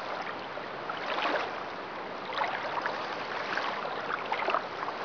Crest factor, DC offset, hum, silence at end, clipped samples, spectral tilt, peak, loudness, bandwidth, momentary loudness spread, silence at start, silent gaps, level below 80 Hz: 22 dB; under 0.1%; none; 0 s; under 0.1%; -4 dB/octave; -12 dBFS; -33 LUFS; 5.4 kHz; 8 LU; 0 s; none; -72 dBFS